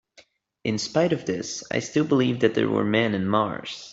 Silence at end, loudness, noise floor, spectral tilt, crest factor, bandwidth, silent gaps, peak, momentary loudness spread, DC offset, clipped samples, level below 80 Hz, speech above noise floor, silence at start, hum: 0 s; -24 LUFS; -57 dBFS; -5 dB/octave; 18 dB; 8 kHz; none; -6 dBFS; 7 LU; under 0.1%; under 0.1%; -62 dBFS; 34 dB; 0.65 s; none